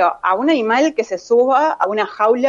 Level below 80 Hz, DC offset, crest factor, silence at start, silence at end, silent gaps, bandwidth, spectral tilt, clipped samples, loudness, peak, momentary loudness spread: -66 dBFS; under 0.1%; 12 dB; 0 s; 0 s; none; 7.4 kHz; -4 dB/octave; under 0.1%; -16 LUFS; -2 dBFS; 4 LU